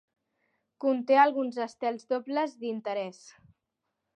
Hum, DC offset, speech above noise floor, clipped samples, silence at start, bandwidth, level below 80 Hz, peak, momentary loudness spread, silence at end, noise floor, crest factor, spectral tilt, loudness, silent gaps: none; under 0.1%; 55 dB; under 0.1%; 0.8 s; 9.4 kHz; -82 dBFS; -10 dBFS; 12 LU; 0.85 s; -84 dBFS; 20 dB; -5 dB/octave; -28 LUFS; none